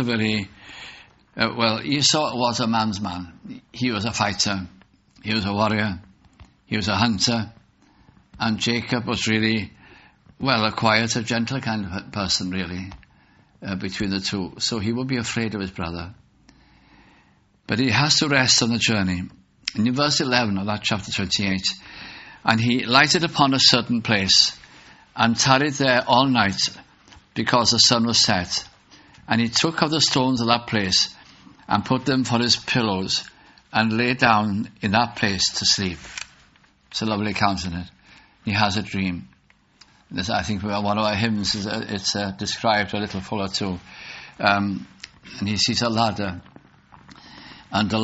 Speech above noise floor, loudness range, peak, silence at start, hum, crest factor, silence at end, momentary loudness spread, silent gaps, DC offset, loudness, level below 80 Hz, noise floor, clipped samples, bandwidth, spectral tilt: 37 dB; 8 LU; 0 dBFS; 0 s; none; 22 dB; 0 s; 17 LU; none; under 0.1%; -21 LUFS; -52 dBFS; -58 dBFS; under 0.1%; 8 kHz; -2.5 dB/octave